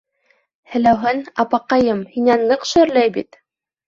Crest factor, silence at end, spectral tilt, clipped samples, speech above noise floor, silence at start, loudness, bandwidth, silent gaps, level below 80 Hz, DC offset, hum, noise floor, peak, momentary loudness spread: 16 dB; 0.65 s; -5 dB/octave; under 0.1%; 46 dB; 0.7 s; -17 LUFS; 7.6 kHz; none; -52 dBFS; under 0.1%; none; -62 dBFS; -2 dBFS; 6 LU